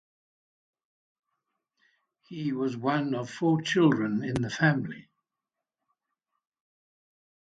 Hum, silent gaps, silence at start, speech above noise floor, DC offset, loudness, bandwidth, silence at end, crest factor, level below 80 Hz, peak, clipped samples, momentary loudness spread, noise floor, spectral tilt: none; none; 2.3 s; 61 dB; under 0.1%; -27 LUFS; 10.5 kHz; 2.45 s; 22 dB; -64 dBFS; -10 dBFS; under 0.1%; 12 LU; -88 dBFS; -6.5 dB/octave